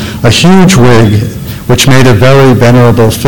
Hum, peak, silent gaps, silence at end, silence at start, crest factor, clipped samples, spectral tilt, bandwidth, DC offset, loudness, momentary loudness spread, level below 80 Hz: none; 0 dBFS; none; 0 s; 0 s; 4 dB; 1%; -5.5 dB/octave; 17.5 kHz; under 0.1%; -4 LUFS; 8 LU; -26 dBFS